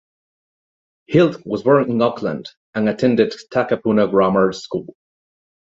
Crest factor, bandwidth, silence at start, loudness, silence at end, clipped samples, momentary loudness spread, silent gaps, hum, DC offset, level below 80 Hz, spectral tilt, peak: 18 dB; 7.8 kHz; 1.1 s; -18 LUFS; 0.9 s; under 0.1%; 12 LU; 2.57-2.73 s; none; under 0.1%; -56 dBFS; -7 dB/octave; 0 dBFS